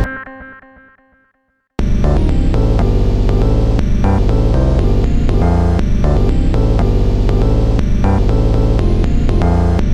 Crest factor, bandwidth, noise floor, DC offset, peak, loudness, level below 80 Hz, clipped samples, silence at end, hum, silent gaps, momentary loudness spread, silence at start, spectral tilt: 12 dB; 8 kHz; -63 dBFS; under 0.1%; 0 dBFS; -15 LUFS; -14 dBFS; under 0.1%; 0 s; none; none; 2 LU; 0 s; -8.5 dB/octave